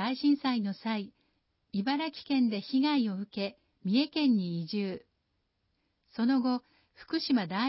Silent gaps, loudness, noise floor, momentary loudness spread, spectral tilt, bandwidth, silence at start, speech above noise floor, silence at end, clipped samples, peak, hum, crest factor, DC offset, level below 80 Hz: none; -31 LUFS; -78 dBFS; 10 LU; -9.5 dB/octave; 5.8 kHz; 0 s; 49 dB; 0 s; under 0.1%; -16 dBFS; none; 14 dB; under 0.1%; -76 dBFS